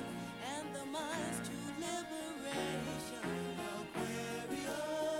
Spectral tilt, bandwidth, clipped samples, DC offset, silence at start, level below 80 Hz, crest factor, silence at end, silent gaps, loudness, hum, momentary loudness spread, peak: -4 dB/octave; 16.5 kHz; under 0.1%; under 0.1%; 0 s; -68 dBFS; 16 dB; 0 s; none; -41 LUFS; none; 4 LU; -26 dBFS